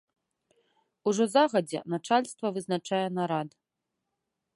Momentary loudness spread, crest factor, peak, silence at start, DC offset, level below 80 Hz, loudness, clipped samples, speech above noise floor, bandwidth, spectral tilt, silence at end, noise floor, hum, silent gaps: 10 LU; 20 dB; -10 dBFS; 1.05 s; under 0.1%; -80 dBFS; -28 LUFS; under 0.1%; 57 dB; 11.5 kHz; -5 dB/octave; 1.05 s; -85 dBFS; none; none